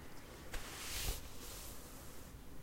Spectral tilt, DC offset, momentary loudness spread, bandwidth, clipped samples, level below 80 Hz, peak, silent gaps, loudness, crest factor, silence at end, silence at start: -2.5 dB/octave; under 0.1%; 12 LU; 16 kHz; under 0.1%; -52 dBFS; -28 dBFS; none; -47 LUFS; 18 dB; 0 s; 0 s